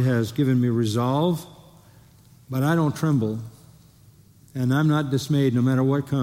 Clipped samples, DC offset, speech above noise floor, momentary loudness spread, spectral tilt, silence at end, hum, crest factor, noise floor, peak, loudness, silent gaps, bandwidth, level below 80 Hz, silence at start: under 0.1%; under 0.1%; 31 dB; 10 LU; -7.5 dB/octave; 0 s; none; 14 dB; -52 dBFS; -10 dBFS; -22 LUFS; none; 16 kHz; -60 dBFS; 0 s